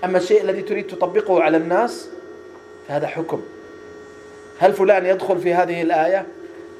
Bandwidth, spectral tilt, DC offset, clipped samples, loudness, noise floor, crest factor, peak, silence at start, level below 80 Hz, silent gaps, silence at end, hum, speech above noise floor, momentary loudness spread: 13.5 kHz; -6 dB/octave; under 0.1%; under 0.1%; -19 LUFS; -40 dBFS; 18 dB; -2 dBFS; 0 s; -68 dBFS; none; 0 s; none; 22 dB; 23 LU